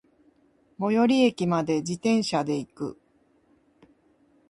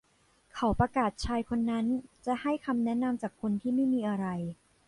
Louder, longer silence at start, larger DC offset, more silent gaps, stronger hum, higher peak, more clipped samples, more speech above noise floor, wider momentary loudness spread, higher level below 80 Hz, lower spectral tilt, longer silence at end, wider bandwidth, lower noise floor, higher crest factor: first, -25 LUFS vs -31 LUFS; first, 0.8 s vs 0.55 s; neither; neither; neither; first, -10 dBFS vs -14 dBFS; neither; about the same, 40 dB vs 37 dB; first, 13 LU vs 7 LU; second, -66 dBFS vs -50 dBFS; second, -5.5 dB/octave vs -7 dB/octave; first, 1.55 s vs 0.35 s; about the same, 11.5 kHz vs 11.5 kHz; about the same, -64 dBFS vs -67 dBFS; about the same, 18 dB vs 16 dB